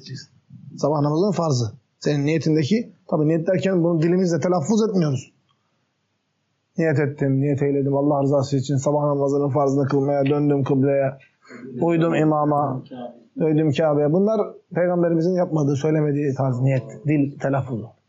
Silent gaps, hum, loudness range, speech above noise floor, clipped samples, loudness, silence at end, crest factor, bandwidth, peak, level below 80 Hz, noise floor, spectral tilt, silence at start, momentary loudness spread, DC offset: none; none; 3 LU; 51 dB; under 0.1%; -21 LUFS; 0.2 s; 12 dB; 8 kHz; -8 dBFS; -68 dBFS; -71 dBFS; -7.5 dB/octave; 0.05 s; 7 LU; under 0.1%